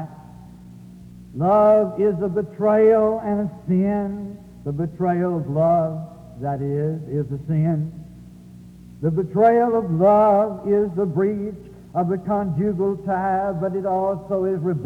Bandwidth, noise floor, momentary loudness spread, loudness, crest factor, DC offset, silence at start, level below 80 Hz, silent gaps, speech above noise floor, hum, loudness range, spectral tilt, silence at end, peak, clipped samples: 8.8 kHz; -42 dBFS; 14 LU; -21 LUFS; 16 dB; under 0.1%; 0 s; -50 dBFS; none; 23 dB; 60 Hz at -50 dBFS; 5 LU; -10.5 dB/octave; 0 s; -4 dBFS; under 0.1%